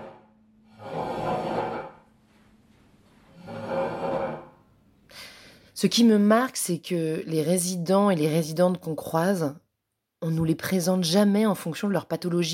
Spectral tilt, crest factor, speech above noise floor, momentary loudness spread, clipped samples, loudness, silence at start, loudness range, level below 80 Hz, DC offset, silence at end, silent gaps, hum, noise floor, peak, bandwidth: -5.5 dB/octave; 18 dB; 58 dB; 19 LU; under 0.1%; -25 LUFS; 0 s; 12 LU; -62 dBFS; under 0.1%; 0 s; none; none; -81 dBFS; -8 dBFS; 17 kHz